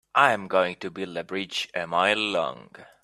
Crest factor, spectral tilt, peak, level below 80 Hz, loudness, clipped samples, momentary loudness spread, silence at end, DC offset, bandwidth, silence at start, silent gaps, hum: 24 dB; -3.5 dB/octave; -2 dBFS; -70 dBFS; -25 LUFS; under 0.1%; 12 LU; 0.2 s; under 0.1%; 13.5 kHz; 0.15 s; none; none